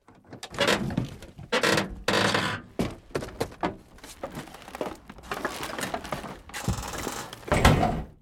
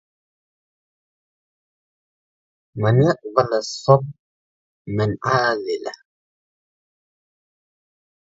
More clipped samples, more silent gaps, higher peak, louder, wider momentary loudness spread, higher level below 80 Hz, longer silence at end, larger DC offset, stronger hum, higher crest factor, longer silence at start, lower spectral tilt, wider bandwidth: neither; second, none vs 4.19-4.85 s; second, -4 dBFS vs 0 dBFS; second, -28 LUFS vs -20 LUFS; first, 16 LU vs 12 LU; first, -40 dBFS vs -56 dBFS; second, 0.1 s vs 2.45 s; neither; neither; about the same, 26 dB vs 24 dB; second, 0.1 s vs 2.75 s; second, -4.5 dB/octave vs -6.5 dB/octave; first, 17.5 kHz vs 7.8 kHz